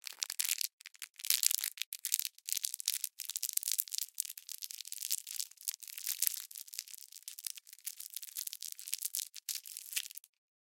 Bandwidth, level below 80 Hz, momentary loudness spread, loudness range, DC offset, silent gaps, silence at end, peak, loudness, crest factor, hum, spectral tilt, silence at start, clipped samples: 17 kHz; under -90 dBFS; 12 LU; 7 LU; under 0.1%; 0.73-0.78 s, 1.10-1.14 s, 1.86-1.92 s; 0.55 s; -2 dBFS; -37 LUFS; 38 dB; none; 9 dB/octave; 0.05 s; under 0.1%